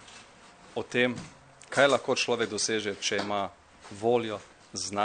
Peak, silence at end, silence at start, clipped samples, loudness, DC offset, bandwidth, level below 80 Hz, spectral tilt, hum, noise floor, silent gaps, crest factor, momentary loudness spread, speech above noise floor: -8 dBFS; 0 s; 0 s; under 0.1%; -28 LUFS; under 0.1%; 9.6 kHz; -68 dBFS; -3 dB/octave; none; -53 dBFS; none; 22 dB; 17 LU; 25 dB